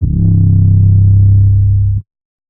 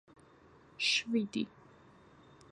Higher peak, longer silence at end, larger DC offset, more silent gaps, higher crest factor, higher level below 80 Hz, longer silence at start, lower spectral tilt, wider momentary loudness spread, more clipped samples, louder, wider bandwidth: first, 0 dBFS vs -20 dBFS; second, 0.5 s vs 1.05 s; neither; neither; second, 8 dB vs 20 dB; first, -20 dBFS vs -74 dBFS; second, 0 s vs 0.8 s; first, -18 dB/octave vs -2.5 dB/octave; second, 6 LU vs 10 LU; neither; first, -9 LUFS vs -33 LUFS; second, 0.7 kHz vs 11 kHz